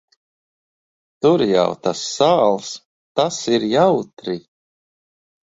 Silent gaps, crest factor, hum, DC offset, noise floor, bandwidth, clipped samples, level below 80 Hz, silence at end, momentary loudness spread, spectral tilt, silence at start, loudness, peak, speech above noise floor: 2.85-3.15 s, 4.13-4.17 s; 18 dB; none; under 0.1%; under -90 dBFS; 8 kHz; under 0.1%; -62 dBFS; 1.05 s; 13 LU; -5 dB/octave; 1.2 s; -18 LUFS; -2 dBFS; over 73 dB